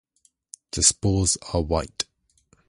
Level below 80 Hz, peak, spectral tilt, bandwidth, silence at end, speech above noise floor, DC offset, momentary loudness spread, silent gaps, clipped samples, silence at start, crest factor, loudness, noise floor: -38 dBFS; -2 dBFS; -3.5 dB/octave; 11.5 kHz; 0.65 s; 42 dB; under 0.1%; 13 LU; none; under 0.1%; 0.75 s; 24 dB; -22 LUFS; -64 dBFS